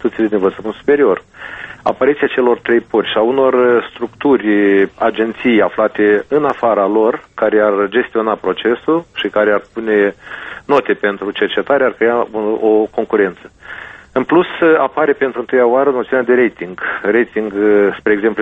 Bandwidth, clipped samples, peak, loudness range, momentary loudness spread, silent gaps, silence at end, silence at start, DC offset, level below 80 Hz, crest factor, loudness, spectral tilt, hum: 4.7 kHz; under 0.1%; 0 dBFS; 2 LU; 8 LU; none; 0 s; 0.05 s; under 0.1%; -52 dBFS; 14 dB; -14 LUFS; -7 dB/octave; none